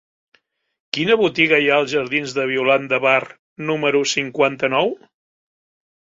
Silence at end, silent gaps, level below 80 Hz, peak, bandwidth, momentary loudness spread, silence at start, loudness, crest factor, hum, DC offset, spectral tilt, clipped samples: 1.1 s; 3.39-3.56 s; -64 dBFS; -2 dBFS; 7.8 kHz; 9 LU; 0.95 s; -18 LUFS; 18 dB; none; under 0.1%; -4 dB/octave; under 0.1%